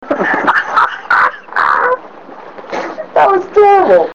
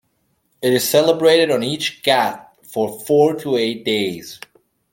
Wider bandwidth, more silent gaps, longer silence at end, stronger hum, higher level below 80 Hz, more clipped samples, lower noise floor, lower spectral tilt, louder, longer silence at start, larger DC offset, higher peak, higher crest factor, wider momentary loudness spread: second, 8 kHz vs 17 kHz; neither; second, 0 s vs 0.55 s; neither; first, -54 dBFS vs -64 dBFS; neither; second, -33 dBFS vs -66 dBFS; about the same, -5 dB/octave vs -4 dB/octave; first, -11 LUFS vs -17 LUFS; second, 0 s vs 0.6 s; first, 0.7% vs under 0.1%; about the same, -2 dBFS vs 0 dBFS; second, 10 dB vs 18 dB; about the same, 14 LU vs 15 LU